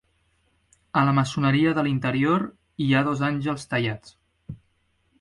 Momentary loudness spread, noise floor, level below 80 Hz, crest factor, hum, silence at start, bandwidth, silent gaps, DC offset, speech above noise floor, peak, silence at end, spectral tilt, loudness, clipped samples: 19 LU; -68 dBFS; -56 dBFS; 18 dB; none; 0.95 s; 11.5 kHz; none; under 0.1%; 45 dB; -6 dBFS; 0.65 s; -6.5 dB/octave; -23 LUFS; under 0.1%